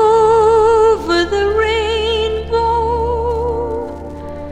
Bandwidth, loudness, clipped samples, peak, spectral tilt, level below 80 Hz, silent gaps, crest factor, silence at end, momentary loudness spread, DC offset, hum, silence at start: 9.6 kHz; -14 LUFS; under 0.1%; -2 dBFS; -5 dB/octave; -30 dBFS; none; 12 dB; 0 s; 13 LU; under 0.1%; none; 0 s